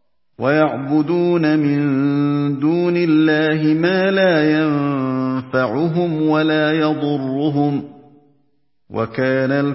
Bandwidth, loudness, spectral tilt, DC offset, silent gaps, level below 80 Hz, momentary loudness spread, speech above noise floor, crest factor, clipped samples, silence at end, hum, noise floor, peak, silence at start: 5.8 kHz; -17 LUFS; -11 dB/octave; under 0.1%; none; -62 dBFS; 6 LU; 51 dB; 16 dB; under 0.1%; 0 s; none; -67 dBFS; -2 dBFS; 0.4 s